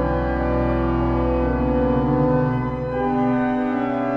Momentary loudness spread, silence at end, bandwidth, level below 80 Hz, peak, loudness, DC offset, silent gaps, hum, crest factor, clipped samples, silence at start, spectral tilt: 3 LU; 0 s; 5.4 kHz; -30 dBFS; -8 dBFS; -21 LUFS; under 0.1%; none; none; 12 dB; under 0.1%; 0 s; -10 dB/octave